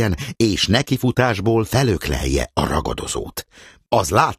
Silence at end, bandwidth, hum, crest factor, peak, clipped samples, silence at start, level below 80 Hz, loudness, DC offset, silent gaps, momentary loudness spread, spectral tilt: 0.05 s; 15 kHz; none; 18 dB; -2 dBFS; under 0.1%; 0 s; -32 dBFS; -19 LUFS; under 0.1%; none; 8 LU; -5 dB/octave